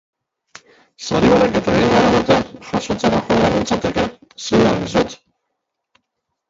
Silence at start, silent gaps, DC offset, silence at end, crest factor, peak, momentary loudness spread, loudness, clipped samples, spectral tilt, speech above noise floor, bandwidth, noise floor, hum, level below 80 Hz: 1 s; none; under 0.1%; 1.35 s; 18 dB; 0 dBFS; 11 LU; -16 LUFS; under 0.1%; -5.5 dB/octave; 60 dB; 7.8 kHz; -76 dBFS; none; -40 dBFS